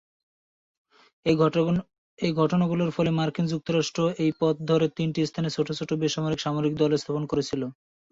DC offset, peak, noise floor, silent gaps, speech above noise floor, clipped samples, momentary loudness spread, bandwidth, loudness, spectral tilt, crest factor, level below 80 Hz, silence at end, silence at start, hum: under 0.1%; -10 dBFS; under -90 dBFS; 1.98-2.17 s; over 65 dB; under 0.1%; 6 LU; 7.8 kHz; -26 LUFS; -6.5 dB/octave; 16 dB; -60 dBFS; 0.4 s; 1.25 s; none